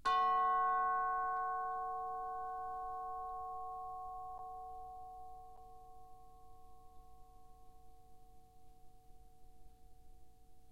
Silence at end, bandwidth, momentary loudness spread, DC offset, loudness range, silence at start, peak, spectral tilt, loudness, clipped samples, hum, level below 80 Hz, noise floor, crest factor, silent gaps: 0 s; 14 kHz; 26 LU; 0.1%; 26 LU; 0.05 s; -24 dBFS; -3.5 dB/octave; -39 LUFS; under 0.1%; none; -64 dBFS; -61 dBFS; 18 dB; none